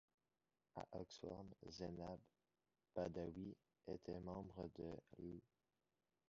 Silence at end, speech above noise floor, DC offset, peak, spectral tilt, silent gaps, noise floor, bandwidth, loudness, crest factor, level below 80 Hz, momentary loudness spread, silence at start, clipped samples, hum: 0.9 s; over 37 dB; under 0.1%; -34 dBFS; -6.5 dB/octave; none; under -90 dBFS; 7.2 kHz; -54 LUFS; 22 dB; -72 dBFS; 9 LU; 0.75 s; under 0.1%; none